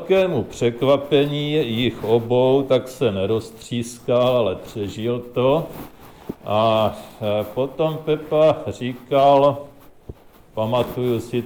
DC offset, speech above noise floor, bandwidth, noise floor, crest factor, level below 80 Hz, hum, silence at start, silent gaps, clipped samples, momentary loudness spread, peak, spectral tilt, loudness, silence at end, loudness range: under 0.1%; 22 dB; over 20 kHz; -41 dBFS; 16 dB; -50 dBFS; none; 0 s; none; under 0.1%; 11 LU; -4 dBFS; -6.5 dB/octave; -20 LUFS; 0 s; 3 LU